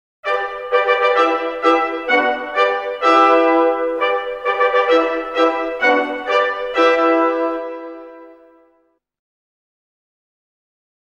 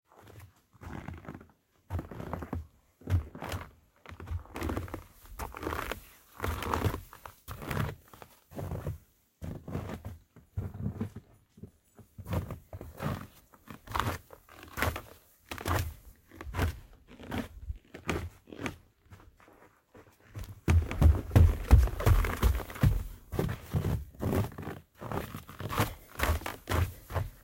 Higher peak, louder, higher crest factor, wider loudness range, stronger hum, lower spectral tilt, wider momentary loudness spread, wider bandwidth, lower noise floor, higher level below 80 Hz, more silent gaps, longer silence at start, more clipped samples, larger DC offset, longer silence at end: first, -2 dBFS vs -8 dBFS; first, -16 LUFS vs -34 LUFS; second, 16 dB vs 24 dB; second, 5 LU vs 14 LU; neither; second, -3 dB/octave vs -6 dB/octave; second, 8 LU vs 23 LU; second, 7.8 kHz vs 17 kHz; about the same, -62 dBFS vs -60 dBFS; second, -56 dBFS vs -38 dBFS; neither; about the same, 0.25 s vs 0.25 s; neither; neither; first, 2.7 s vs 0.1 s